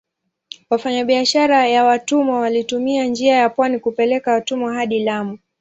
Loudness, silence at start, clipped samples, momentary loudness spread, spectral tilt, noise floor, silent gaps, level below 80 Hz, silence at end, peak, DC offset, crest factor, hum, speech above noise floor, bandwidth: -17 LUFS; 0.7 s; under 0.1%; 8 LU; -3.5 dB/octave; -42 dBFS; none; -64 dBFS; 0.25 s; -2 dBFS; under 0.1%; 14 dB; none; 25 dB; 8.4 kHz